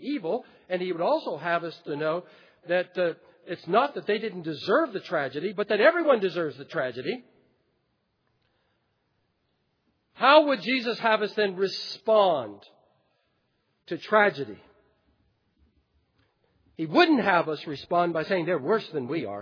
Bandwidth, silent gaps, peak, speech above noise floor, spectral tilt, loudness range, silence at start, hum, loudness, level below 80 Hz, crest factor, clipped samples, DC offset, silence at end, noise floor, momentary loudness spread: 5.4 kHz; none; -4 dBFS; 49 dB; -6 dB/octave; 7 LU; 0 s; none; -25 LUFS; -76 dBFS; 22 dB; under 0.1%; under 0.1%; 0 s; -74 dBFS; 13 LU